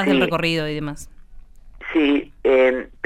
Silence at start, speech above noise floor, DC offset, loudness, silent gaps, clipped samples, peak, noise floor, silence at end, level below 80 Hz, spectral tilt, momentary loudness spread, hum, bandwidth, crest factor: 0 s; 21 dB; under 0.1%; -19 LUFS; none; under 0.1%; -6 dBFS; -40 dBFS; 0.15 s; -42 dBFS; -6 dB/octave; 15 LU; none; 13 kHz; 14 dB